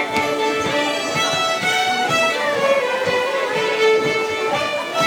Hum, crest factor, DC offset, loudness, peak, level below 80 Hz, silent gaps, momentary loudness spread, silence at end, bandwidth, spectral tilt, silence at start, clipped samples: none; 14 dB; under 0.1%; -18 LUFS; -4 dBFS; -58 dBFS; none; 4 LU; 0 s; 19.5 kHz; -2.5 dB/octave; 0 s; under 0.1%